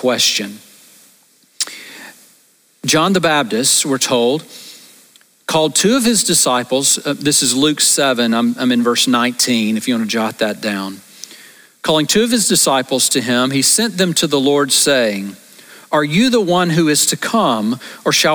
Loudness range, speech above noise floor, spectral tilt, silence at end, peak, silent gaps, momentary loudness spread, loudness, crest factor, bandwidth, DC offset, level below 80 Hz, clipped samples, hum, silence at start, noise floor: 4 LU; 38 dB; -2.5 dB/octave; 0 s; -2 dBFS; none; 11 LU; -14 LUFS; 14 dB; over 20 kHz; under 0.1%; -56 dBFS; under 0.1%; none; 0 s; -53 dBFS